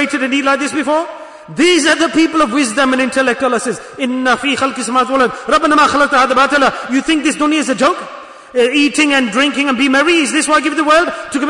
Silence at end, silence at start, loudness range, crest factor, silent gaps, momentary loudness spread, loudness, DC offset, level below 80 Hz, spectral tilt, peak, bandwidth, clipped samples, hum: 0 s; 0 s; 2 LU; 12 dB; none; 8 LU; -12 LUFS; under 0.1%; -48 dBFS; -2.5 dB/octave; -2 dBFS; 11 kHz; under 0.1%; none